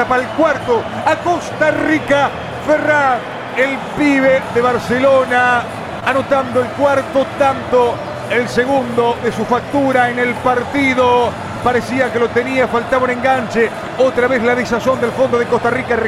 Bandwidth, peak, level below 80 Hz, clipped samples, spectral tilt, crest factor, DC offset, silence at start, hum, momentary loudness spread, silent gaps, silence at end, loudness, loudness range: 14 kHz; -2 dBFS; -44 dBFS; under 0.1%; -5.5 dB/octave; 14 dB; under 0.1%; 0 s; none; 5 LU; none; 0 s; -15 LUFS; 1 LU